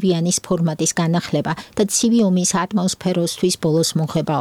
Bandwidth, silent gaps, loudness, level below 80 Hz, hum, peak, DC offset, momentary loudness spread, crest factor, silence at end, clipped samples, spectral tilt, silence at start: 16 kHz; none; -19 LUFS; -54 dBFS; none; -6 dBFS; under 0.1%; 5 LU; 12 dB; 0 s; under 0.1%; -4.5 dB/octave; 0 s